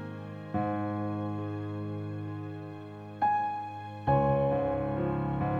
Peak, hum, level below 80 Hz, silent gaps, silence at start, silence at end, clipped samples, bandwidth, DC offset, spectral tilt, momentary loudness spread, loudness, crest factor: -14 dBFS; none; -52 dBFS; none; 0 s; 0 s; under 0.1%; 6 kHz; under 0.1%; -10 dB/octave; 14 LU; -32 LUFS; 18 dB